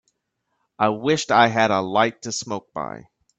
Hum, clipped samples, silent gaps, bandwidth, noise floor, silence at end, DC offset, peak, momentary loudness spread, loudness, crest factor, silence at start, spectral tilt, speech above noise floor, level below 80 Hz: none; under 0.1%; none; 9 kHz; -75 dBFS; 0.4 s; under 0.1%; -2 dBFS; 15 LU; -20 LUFS; 20 dB; 0.8 s; -4 dB/octave; 55 dB; -62 dBFS